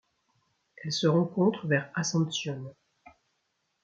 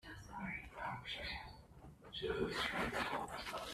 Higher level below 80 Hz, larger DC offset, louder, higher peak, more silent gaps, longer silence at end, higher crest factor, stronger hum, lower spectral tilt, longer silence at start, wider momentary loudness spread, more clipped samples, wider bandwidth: second, -74 dBFS vs -60 dBFS; neither; first, -28 LUFS vs -43 LUFS; first, -12 dBFS vs -24 dBFS; neither; first, 1.1 s vs 0 s; about the same, 18 dB vs 20 dB; neither; about the same, -5 dB/octave vs -4 dB/octave; first, 0.8 s vs 0.05 s; about the same, 15 LU vs 16 LU; neither; second, 7.8 kHz vs 15 kHz